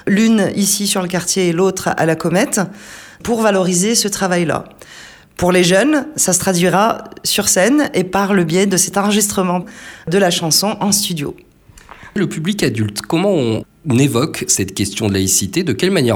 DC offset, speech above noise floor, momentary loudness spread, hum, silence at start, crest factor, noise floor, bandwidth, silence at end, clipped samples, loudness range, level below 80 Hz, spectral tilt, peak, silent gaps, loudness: under 0.1%; 26 dB; 8 LU; none; 0.05 s; 14 dB; -41 dBFS; 19 kHz; 0 s; under 0.1%; 3 LU; -48 dBFS; -4 dB/octave; -2 dBFS; none; -15 LUFS